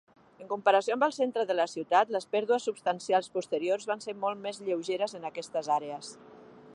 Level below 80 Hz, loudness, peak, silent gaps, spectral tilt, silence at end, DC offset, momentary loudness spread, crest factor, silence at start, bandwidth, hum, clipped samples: -82 dBFS; -30 LUFS; -10 dBFS; none; -3.5 dB/octave; 0 s; under 0.1%; 10 LU; 20 dB; 0.4 s; 11.5 kHz; none; under 0.1%